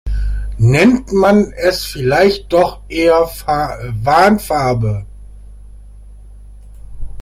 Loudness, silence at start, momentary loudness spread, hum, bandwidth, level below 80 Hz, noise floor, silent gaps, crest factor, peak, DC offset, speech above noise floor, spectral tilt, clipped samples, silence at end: -14 LUFS; 0.05 s; 11 LU; 50 Hz at -35 dBFS; 16 kHz; -28 dBFS; -36 dBFS; none; 14 dB; 0 dBFS; under 0.1%; 23 dB; -6.5 dB/octave; under 0.1%; 0 s